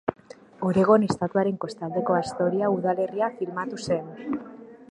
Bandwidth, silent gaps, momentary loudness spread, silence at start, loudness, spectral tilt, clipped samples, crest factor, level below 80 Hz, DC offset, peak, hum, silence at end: 11 kHz; none; 13 LU; 0.1 s; -25 LUFS; -7 dB/octave; under 0.1%; 20 dB; -62 dBFS; under 0.1%; -6 dBFS; none; 0.1 s